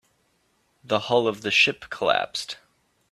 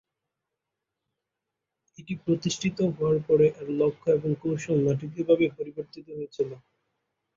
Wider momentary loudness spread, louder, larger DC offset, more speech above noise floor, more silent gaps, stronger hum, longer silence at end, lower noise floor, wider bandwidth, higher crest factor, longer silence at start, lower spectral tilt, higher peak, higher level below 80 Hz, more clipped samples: about the same, 13 LU vs 14 LU; first, -23 LUFS vs -26 LUFS; neither; second, 44 dB vs 60 dB; neither; neither; second, 0.55 s vs 0.8 s; second, -68 dBFS vs -86 dBFS; first, 13.5 kHz vs 7.8 kHz; about the same, 22 dB vs 18 dB; second, 0.9 s vs 2 s; second, -3 dB/octave vs -6.5 dB/octave; first, -4 dBFS vs -10 dBFS; about the same, -66 dBFS vs -64 dBFS; neither